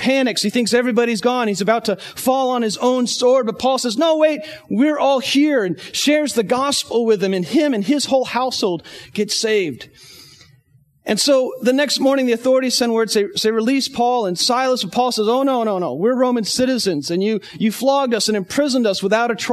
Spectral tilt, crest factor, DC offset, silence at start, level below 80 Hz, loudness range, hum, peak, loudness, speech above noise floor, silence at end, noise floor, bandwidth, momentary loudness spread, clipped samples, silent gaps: -3.5 dB/octave; 16 dB; under 0.1%; 0 s; -62 dBFS; 3 LU; none; -2 dBFS; -17 LUFS; 38 dB; 0 s; -56 dBFS; 13.5 kHz; 5 LU; under 0.1%; none